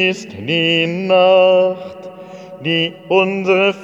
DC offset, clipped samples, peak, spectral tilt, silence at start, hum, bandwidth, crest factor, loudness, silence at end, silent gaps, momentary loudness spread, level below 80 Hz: under 0.1%; under 0.1%; -2 dBFS; -5.5 dB/octave; 0 s; none; 7.8 kHz; 14 dB; -14 LUFS; 0 s; none; 22 LU; -66 dBFS